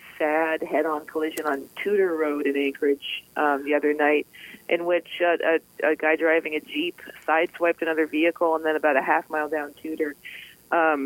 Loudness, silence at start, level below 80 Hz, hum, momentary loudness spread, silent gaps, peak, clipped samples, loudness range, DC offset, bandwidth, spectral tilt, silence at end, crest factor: -24 LUFS; 0.05 s; -72 dBFS; none; 9 LU; none; -6 dBFS; under 0.1%; 2 LU; under 0.1%; 17 kHz; -4 dB/octave; 0 s; 18 dB